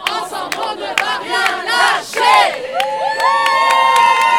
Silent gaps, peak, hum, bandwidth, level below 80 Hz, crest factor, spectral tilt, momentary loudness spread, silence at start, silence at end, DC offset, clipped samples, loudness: none; 0 dBFS; none; 18 kHz; -62 dBFS; 14 dB; -0.5 dB/octave; 10 LU; 0 s; 0 s; 0.1%; under 0.1%; -14 LUFS